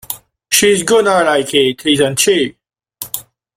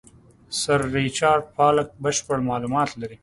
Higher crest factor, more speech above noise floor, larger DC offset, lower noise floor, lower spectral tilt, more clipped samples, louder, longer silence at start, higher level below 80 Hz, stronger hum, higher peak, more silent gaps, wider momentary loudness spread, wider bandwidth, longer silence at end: about the same, 14 dB vs 18 dB; about the same, 21 dB vs 22 dB; neither; second, -33 dBFS vs -44 dBFS; second, -2.5 dB/octave vs -4 dB/octave; neither; first, -12 LUFS vs -22 LUFS; second, 0.1 s vs 0.5 s; about the same, -52 dBFS vs -52 dBFS; neither; first, 0 dBFS vs -4 dBFS; neither; first, 15 LU vs 6 LU; first, 16.5 kHz vs 11.5 kHz; first, 0.35 s vs 0.1 s